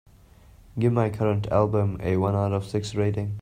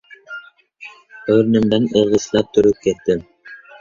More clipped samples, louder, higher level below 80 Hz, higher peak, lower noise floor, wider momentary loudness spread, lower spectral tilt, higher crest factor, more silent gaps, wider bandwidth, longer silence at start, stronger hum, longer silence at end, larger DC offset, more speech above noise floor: neither; second, -25 LUFS vs -16 LUFS; about the same, -50 dBFS vs -50 dBFS; second, -8 dBFS vs -2 dBFS; first, -52 dBFS vs -41 dBFS; second, 4 LU vs 23 LU; first, -8 dB/octave vs -6 dB/octave; about the same, 18 dB vs 16 dB; neither; first, 10 kHz vs 7.4 kHz; first, 0.75 s vs 0.3 s; neither; second, 0 s vs 0.25 s; neither; about the same, 28 dB vs 26 dB